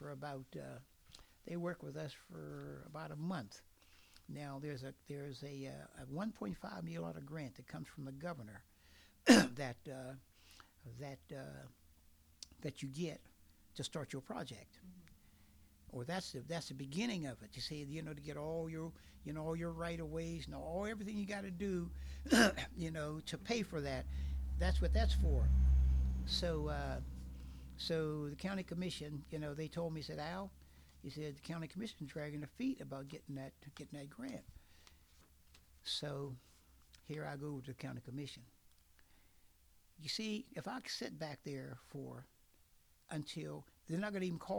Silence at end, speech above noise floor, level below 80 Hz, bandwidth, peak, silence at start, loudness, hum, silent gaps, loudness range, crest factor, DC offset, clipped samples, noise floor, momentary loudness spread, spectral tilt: 0 s; 29 dB; -46 dBFS; 19 kHz; -12 dBFS; 0 s; -42 LUFS; none; none; 12 LU; 30 dB; under 0.1%; under 0.1%; -70 dBFS; 18 LU; -5 dB/octave